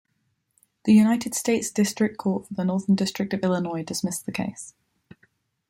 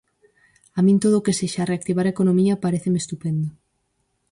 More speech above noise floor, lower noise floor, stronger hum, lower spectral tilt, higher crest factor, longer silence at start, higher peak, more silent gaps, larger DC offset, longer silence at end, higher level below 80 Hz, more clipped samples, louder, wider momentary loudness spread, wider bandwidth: about the same, 50 dB vs 51 dB; about the same, -73 dBFS vs -71 dBFS; neither; second, -5 dB/octave vs -6.5 dB/octave; about the same, 18 dB vs 14 dB; about the same, 0.85 s vs 0.75 s; about the same, -8 dBFS vs -8 dBFS; neither; neither; first, 1 s vs 0.8 s; second, -64 dBFS vs -58 dBFS; neither; second, -24 LUFS vs -21 LUFS; first, 12 LU vs 8 LU; first, 16.5 kHz vs 11.5 kHz